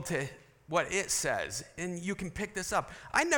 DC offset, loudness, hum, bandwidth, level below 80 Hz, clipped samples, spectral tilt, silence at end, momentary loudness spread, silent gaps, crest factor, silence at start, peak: under 0.1%; -33 LUFS; none; 18 kHz; -58 dBFS; under 0.1%; -3 dB/octave; 0 s; 8 LU; none; 24 dB; 0 s; -10 dBFS